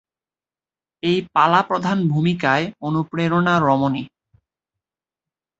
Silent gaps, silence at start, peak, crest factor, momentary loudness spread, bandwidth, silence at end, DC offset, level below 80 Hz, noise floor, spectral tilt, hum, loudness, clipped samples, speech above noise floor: none; 1.05 s; -2 dBFS; 20 dB; 8 LU; 7.8 kHz; 1.55 s; under 0.1%; -58 dBFS; under -90 dBFS; -7 dB/octave; none; -19 LUFS; under 0.1%; over 72 dB